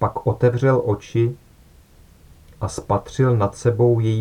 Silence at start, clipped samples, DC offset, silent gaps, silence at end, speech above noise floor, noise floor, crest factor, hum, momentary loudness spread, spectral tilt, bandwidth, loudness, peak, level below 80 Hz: 0 s; under 0.1%; under 0.1%; none; 0 s; 31 dB; -49 dBFS; 16 dB; none; 12 LU; -8 dB/octave; 11 kHz; -20 LUFS; -4 dBFS; -46 dBFS